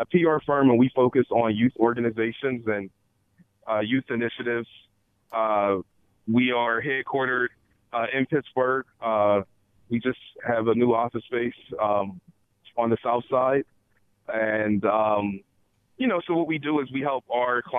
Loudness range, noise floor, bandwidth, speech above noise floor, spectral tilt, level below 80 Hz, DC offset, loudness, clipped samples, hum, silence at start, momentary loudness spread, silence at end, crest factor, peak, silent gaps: 3 LU; -67 dBFS; 3.8 kHz; 43 dB; -9 dB/octave; -64 dBFS; under 0.1%; -25 LUFS; under 0.1%; none; 0 s; 10 LU; 0 s; 20 dB; -6 dBFS; none